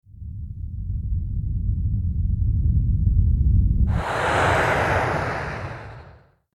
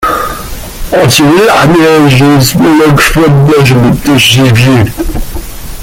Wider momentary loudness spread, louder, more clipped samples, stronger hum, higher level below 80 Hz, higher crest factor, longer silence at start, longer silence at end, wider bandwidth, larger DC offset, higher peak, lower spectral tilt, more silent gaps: about the same, 15 LU vs 15 LU; second, -23 LUFS vs -5 LUFS; second, under 0.1% vs 0.3%; neither; about the same, -26 dBFS vs -22 dBFS; first, 14 dB vs 6 dB; first, 0.15 s vs 0 s; first, 0.4 s vs 0 s; second, 12 kHz vs 17.5 kHz; neither; second, -8 dBFS vs 0 dBFS; first, -6.5 dB/octave vs -5 dB/octave; neither